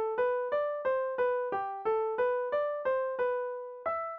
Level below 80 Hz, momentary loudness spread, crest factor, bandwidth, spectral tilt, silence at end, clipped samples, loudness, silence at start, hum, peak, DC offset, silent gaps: -72 dBFS; 5 LU; 12 dB; 4.4 kHz; -6 dB/octave; 0 s; under 0.1%; -32 LUFS; 0 s; none; -20 dBFS; under 0.1%; none